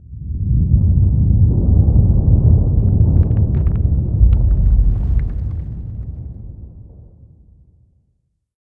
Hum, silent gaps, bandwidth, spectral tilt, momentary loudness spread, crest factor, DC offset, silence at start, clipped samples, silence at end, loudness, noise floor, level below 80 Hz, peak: none; none; 2.2 kHz; -14 dB/octave; 15 LU; 14 dB; under 0.1%; 0.1 s; under 0.1%; 1.8 s; -15 LUFS; -66 dBFS; -18 dBFS; 0 dBFS